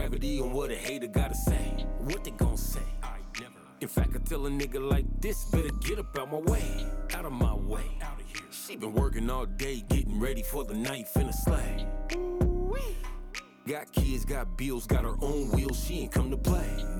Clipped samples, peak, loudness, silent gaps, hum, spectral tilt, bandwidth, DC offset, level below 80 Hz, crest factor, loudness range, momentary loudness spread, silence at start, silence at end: under 0.1%; -14 dBFS; -32 LUFS; none; none; -5.5 dB/octave; 19 kHz; under 0.1%; -32 dBFS; 16 dB; 2 LU; 10 LU; 0 s; 0 s